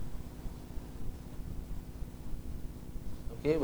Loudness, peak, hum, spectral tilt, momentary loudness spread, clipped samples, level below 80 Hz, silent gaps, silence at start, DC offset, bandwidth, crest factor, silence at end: -44 LUFS; -16 dBFS; none; -7 dB/octave; 5 LU; under 0.1%; -42 dBFS; none; 0 s; under 0.1%; over 20 kHz; 20 dB; 0 s